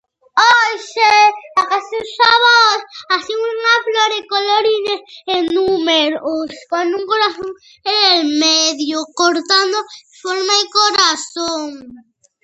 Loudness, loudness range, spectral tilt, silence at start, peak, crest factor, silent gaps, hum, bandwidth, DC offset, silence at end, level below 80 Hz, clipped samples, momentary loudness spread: -14 LUFS; 4 LU; -0.5 dB/octave; 0.35 s; 0 dBFS; 16 dB; none; none; 9 kHz; under 0.1%; 0.45 s; -62 dBFS; under 0.1%; 12 LU